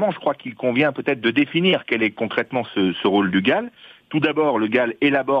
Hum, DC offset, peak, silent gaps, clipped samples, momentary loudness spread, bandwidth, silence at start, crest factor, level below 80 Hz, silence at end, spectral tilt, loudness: none; under 0.1%; -2 dBFS; none; under 0.1%; 6 LU; 5.2 kHz; 0 s; 18 dB; -64 dBFS; 0 s; -8 dB/octave; -20 LUFS